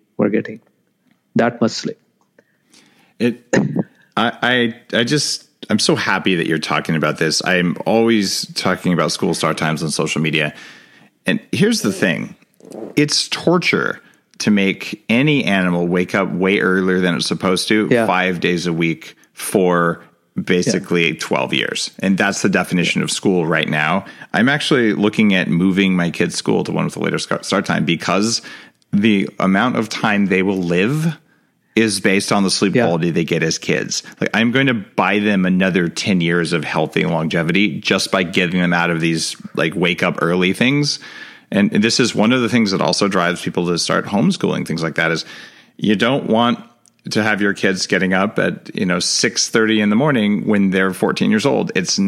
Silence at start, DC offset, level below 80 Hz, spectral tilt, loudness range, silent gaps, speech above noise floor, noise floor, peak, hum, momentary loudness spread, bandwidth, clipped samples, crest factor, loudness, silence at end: 0.2 s; under 0.1%; -60 dBFS; -4.5 dB/octave; 3 LU; none; 44 dB; -61 dBFS; -2 dBFS; none; 7 LU; 15 kHz; under 0.1%; 16 dB; -17 LUFS; 0 s